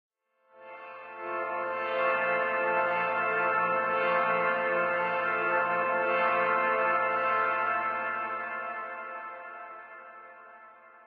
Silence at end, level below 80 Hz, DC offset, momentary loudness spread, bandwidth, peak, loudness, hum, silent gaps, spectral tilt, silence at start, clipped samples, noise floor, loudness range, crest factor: 0.1 s; -86 dBFS; under 0.1%; 18 LU; 5.2 kHz; -14 dBFS; -28 LUFS; none; none; -1.5 dB/octave; 0.55 s; under 0.1%; -63 dBFS; 5 LU; 14 dB